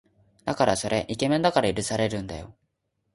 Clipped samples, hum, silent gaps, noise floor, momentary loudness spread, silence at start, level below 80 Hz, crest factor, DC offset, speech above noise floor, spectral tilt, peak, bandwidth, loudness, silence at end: under 0.1%; none; none; -76 dBFS; 13 LU; 0.45 s; -52 dBFS; 20 dB; under 0.1%; 51 dB; -4.5 dB/octave; -6 dBFS; 11.5 kHz; -25 LUFS; 0.65 s